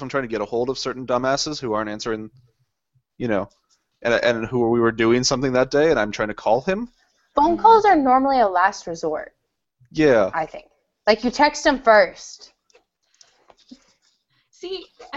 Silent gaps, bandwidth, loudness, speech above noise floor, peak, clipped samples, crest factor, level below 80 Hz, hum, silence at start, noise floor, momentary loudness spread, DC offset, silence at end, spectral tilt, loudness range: none; 8 kHz; -20 LUFS; 49 dB; -2 dBFS; under 0.1%; 20 dB; -50 dBFS; none; 0 s; -69 dBFS; 16 LU; under 0.1%; 0 s; -4.5 dB/octave; 7 LU